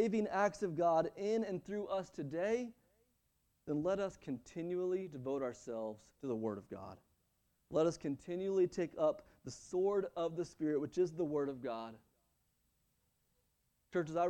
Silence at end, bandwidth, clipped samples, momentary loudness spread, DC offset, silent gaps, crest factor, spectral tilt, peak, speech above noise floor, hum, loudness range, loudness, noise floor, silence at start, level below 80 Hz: 0 s; 9.8 kHz; under 0.1%; 12 LU; under 0.1%; none; 18 dB; -6.5 dB/octave; -20 dBFS; 42 dB; none; 5 LU; -38 LUFS; -80 dBFS; 0 s; -72 dBFS